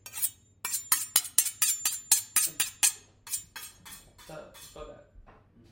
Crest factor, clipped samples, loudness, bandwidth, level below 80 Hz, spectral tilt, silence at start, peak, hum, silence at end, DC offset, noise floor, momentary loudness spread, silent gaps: 28 dB; under 0.1%; -27 LUFS; 17 kHz; -62 dBFS; 2 dB/octave; 0.05 s; -4 dBFS; none; 0.5 s; under 0.1%; -57 dBFS; 23 LU; none